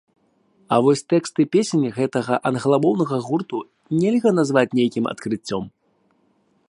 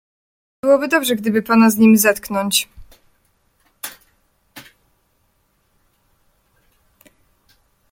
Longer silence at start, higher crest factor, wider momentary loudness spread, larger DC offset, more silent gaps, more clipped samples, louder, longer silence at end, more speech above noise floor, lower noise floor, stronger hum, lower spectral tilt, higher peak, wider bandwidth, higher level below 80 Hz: about the same, 0.7 s vs 0.65 s; about the same, 20 dB vs 18 dB; second, 9 LU vs 21 LU; neither; neither; neither; second, -20 LUFS vs -15 LUFS; second, 1 s vs 3.3 s; second, 44 dB vs 49 dB; about the same, -64 dBFS vs -63 dBFS; neither; first, -6 dB/octave vs -4 dB/octave; about the same, -2 dBFS vs -2 dBFS; second, 11.5 kHz vs 16.5 kHz; second, -64 dBFS vs -56 dBFS